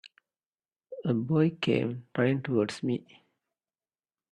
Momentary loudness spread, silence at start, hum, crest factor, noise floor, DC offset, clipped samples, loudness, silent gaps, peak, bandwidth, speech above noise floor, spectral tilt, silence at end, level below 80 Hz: 9 LU; 0.05 s; none; 18 dB; under -90 dBFS; under 0.1%; under 0.1%; -29 LUFS; 0.46-0.58 s; -12 dBFS; 11 kHz; over 62 dB; -7.5 dB/octave; 1.3 s; -70 dBFS